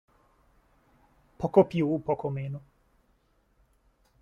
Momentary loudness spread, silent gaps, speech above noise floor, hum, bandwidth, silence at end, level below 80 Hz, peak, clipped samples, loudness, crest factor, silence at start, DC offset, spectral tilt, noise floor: 15 LU; none; 42 dB; none; 7 kHz; 1.65 s; -62 dBFS; -6 dBFS; under 0.1%; -27 LUFS; 24 dB; 1.4 s; under 0.1%; -9.5 dB/octave; -68 dBFS